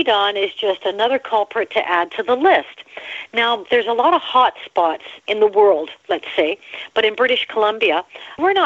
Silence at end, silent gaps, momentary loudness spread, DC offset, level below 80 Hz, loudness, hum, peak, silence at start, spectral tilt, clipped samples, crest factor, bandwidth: 0 s; none; 9 LU; under 0.1%; -66 dBFS; -18 LUFS; none; -2 dBFS; 0 s; -4 dB/octave; under 0.1%; 16 dB; 7.6 kHz